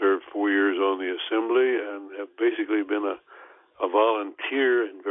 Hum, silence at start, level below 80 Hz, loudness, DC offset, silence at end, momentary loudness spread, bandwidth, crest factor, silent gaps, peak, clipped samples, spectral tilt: none; 0 s; -78 dBFS; -25 LUFS; under 0.1%; 0 s; 9 LU; 3.8 kHz; 16 dB; none; -8 dBFS; under 0.1%; -7 dB/octave